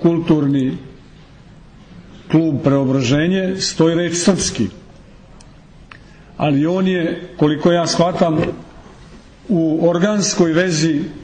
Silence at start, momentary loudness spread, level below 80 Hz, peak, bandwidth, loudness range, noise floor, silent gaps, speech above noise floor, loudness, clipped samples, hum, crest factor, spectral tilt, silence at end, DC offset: 0 s; 7 LU; -46 dBFS; -2 dBFS; 9.6 kHz; 3 LU; -42 dBFS; none; 26 dB; -16 LUFS; under 0.1%; none; 14 dB; -5.5 dB/octave; 0 s; under 0.1%